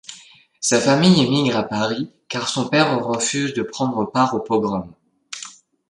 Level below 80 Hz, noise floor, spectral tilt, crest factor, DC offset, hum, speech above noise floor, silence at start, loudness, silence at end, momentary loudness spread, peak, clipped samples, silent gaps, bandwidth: -58 dBFS; -47 dBFS; -4.5 dB/octave; 18 dB; under 0.1%; none; 28 dB; 0.1 s; -19 LUFS; 0.4 s; 18 LU; -2 dBFS; under 0.1%; none; 11.5 kHz